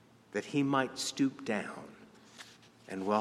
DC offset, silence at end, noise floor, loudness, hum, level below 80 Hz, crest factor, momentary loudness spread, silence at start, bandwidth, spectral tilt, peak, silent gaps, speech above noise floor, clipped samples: under 0.1%; 0 s; -55 dBFS; -34 LUFS; none; -78 dBFS; 20 dB; 21 LU; 0.35 s; 13.5 kHz; -4.5 dB/octave; -14 dBFS; none; 22 dB; under 0.1%